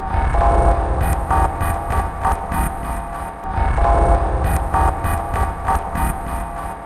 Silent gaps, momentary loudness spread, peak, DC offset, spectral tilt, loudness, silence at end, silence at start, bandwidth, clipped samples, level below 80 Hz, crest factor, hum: none; 10 LU; -2 dBFS; under 0.1%; -6.5 dB/octave; -20 LUFS; 0 s; 0 s; 15 kHz; under 0.1%; -22 dBFS; 16 dB; none